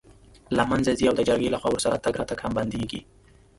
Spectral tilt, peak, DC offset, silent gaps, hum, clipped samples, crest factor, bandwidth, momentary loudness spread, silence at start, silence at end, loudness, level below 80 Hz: -5 dB/octave; -6 dBFS; under 0.1%; none; none; under 0.1%; 18 dB; 11.5 kHz; 8 LU; 0.1 s; 0.55 s; -25 LUFS; -48 dBFS